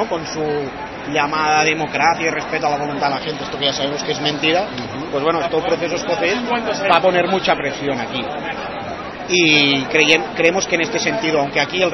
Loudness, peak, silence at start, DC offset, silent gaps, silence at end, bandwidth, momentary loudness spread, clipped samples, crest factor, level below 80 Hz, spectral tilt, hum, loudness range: -17 LUFS; 0 dBFS; 0 s; under 0.1%; none; 0 s; 6.8 kHz; 11 LU; under 0.1%; 18 dB; -48 dBFS; -3.5 dB/octave; none; 4 LU